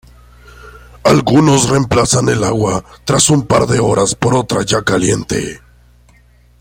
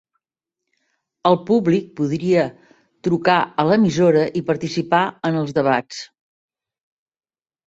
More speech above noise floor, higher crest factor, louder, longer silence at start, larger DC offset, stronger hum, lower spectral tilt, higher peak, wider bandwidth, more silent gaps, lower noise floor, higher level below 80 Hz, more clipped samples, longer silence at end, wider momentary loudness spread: second, 35 dB vs 67 dB; about the same, 14 dB vs 18 dB; first, -13 LUFS vs -19 LUFS; second, 0.65 s vs 1.25 s; neither; first, 60 Hz at -35 dBFS vs none; second, -4.5 dB/octave vs -6.5 dB/octave; about the same, 0 dBFS vs -2 dBFS; first, 16.5 kHz vs 8 kHz; neither; second, -47 dBFS vs -85 dBFS; first, -38 dBFS vs -60 dBFS; neither; second, 1.05 s vs 1.6 s; about the same, 7 LU vs 8 LU